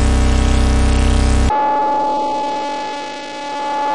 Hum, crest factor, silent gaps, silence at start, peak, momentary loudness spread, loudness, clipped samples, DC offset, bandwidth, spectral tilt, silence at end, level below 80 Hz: none; 12 dB; none; 0 s; -4 dBFS; 9 LU; -17 LUFS; under 0.1%; under 0.1%; 11.5 kHz; -5.5 dB/octave; 0 s; -18 dBFS